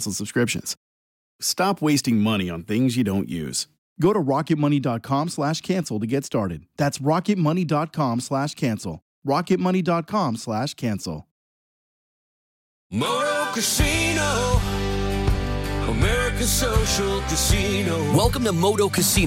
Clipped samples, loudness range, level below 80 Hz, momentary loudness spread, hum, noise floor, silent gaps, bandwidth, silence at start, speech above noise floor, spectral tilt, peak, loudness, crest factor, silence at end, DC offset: under 0.1%; 4 LU; -34 dBFS; 7 LU; none; under -90 dBFS; 0.77-1.39 s, 3.78-3.96 s, 9.02-9.22 s, 11.31-12.90 s; 17 kHz; 0 s; over 68 dB; -4.5 dB/octave; -8 dBFS; -23 LUFS; 16 dB; 0 s; under 0.1%